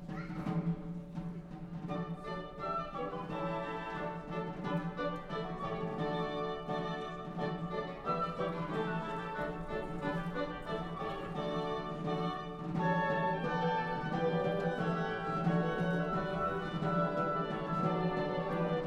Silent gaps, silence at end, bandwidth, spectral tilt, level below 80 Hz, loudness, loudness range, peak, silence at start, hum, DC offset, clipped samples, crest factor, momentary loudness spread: none; 0 s; 7.8 kHz; -7.5 dB/octave; -54 dBFS; -37 LUFS; 6 LU; -20 dBFS; 0 s; none; under 0.1%; under 0.1%; 16 dB; 8 LU